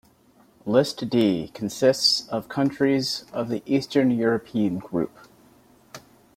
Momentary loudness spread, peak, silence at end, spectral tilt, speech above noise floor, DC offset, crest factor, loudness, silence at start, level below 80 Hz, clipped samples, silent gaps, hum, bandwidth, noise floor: 9 LU; -6 dBFS; 0.35 s; -5 dB/octave; 34 dB; under 0.1%; 18 dB; -23 LUFS; 0.65 s; -62 dBFS; under 0.1%; none; none; 16 kHz; -57 dBFS